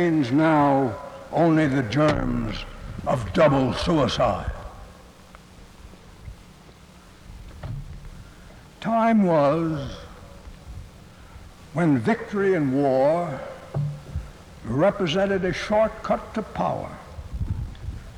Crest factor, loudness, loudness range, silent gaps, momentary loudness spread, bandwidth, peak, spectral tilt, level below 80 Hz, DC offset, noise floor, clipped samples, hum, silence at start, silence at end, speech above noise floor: 16 dB; -23 LUFS; 16 LU; none; 23 LU; 13 kHz; -8 dBFS; -7 dB/octave; -42 dBFS; under 0.1%; -48 dBFS; under 0.1%; none; 0 s; 0 s; 27 dB